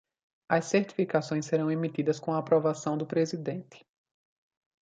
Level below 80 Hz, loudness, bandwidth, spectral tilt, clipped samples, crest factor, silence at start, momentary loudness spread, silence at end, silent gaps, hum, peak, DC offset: -76 dBFS; -29 LUFS; 9.2 kHz; -6 dB/octave; under 0.1%; 20 dB; 0.5 s; 6 LU; 1.05 s; none; none; -10 dBFS; under 0.1%